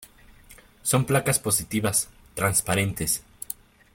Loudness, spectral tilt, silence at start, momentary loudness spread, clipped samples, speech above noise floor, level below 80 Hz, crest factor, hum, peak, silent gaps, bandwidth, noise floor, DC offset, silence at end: -24 LUFS; -3.5 dB/octave; 0 s; 14 LU; under 0.1%; 27 dB; -50 dBFS; 20 dB; none; -6 dBFS; none; 17 kHz; -51 dBFS; under 0.1%; 0.4 s